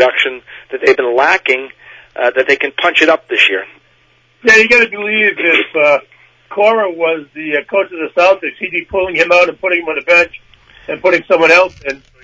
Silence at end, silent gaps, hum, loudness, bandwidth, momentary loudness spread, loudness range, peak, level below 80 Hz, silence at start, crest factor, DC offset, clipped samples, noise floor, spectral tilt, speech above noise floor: 0.25 s; none; none; -11 LUFS; 8 kHz; 10 LU; 3 LU; 0 dBFS; -52 dBFS; 0 s; 14 dB; under 0.1%; 0.1%; -52 dBFS; -3 dB/octave; 40 dB